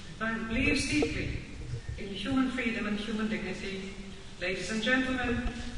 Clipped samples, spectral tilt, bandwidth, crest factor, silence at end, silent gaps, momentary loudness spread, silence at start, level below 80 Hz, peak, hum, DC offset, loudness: under 0.1%; -4.5 dB/octave; 10.5 kHz; 18 dB; 0 s; none; 13 LU; 0 s; -44 dBFS; -14 dBFS; none; 0.3%; -32 LUFS